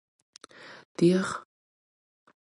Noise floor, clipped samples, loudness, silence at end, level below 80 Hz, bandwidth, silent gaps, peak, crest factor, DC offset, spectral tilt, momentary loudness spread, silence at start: under -90 dBFS; under 0.1%; -26 LUFS; 1.1 s; -72 dBFS; 11.5 kHz; 0.85-0.95 s; -10 dBFS; 20 dB; under 0.1%; -6.5 dB/octave; 24 LU; 0.65 s